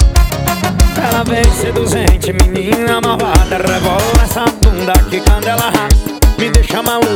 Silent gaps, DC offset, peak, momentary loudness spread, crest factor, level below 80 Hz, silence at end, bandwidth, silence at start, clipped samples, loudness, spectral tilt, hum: none; under 0.1%; 0 dBFS; 3 LU; 10 dB; -14 dBFS; 0 s; 19.5 kHz; 0 s; 0.5%; -12 LUFS; -5 dB/octave; none